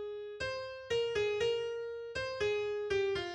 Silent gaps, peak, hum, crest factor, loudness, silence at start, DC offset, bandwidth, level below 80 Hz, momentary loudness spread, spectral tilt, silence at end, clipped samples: none; -22 dBFS; none; 12 dB; -35 LUFS; 0 s; under 0.1%; 9.8 kHz; -62 dBFS; 8 LU; -4 dB/octave; 0 s; under 0.1%